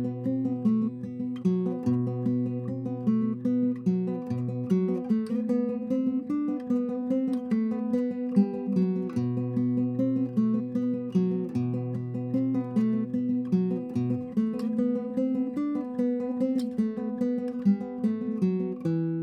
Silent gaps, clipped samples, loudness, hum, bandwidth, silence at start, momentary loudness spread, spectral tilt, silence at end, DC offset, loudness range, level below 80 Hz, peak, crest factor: none; under 0.1%; -28 LUFS; none; 6.4 kHz; 0 s; 3 LU; -10 dB/octave; 0 s; under 0.1%; 1 LU; -72 dBFS; -12 dBFS; 16 dB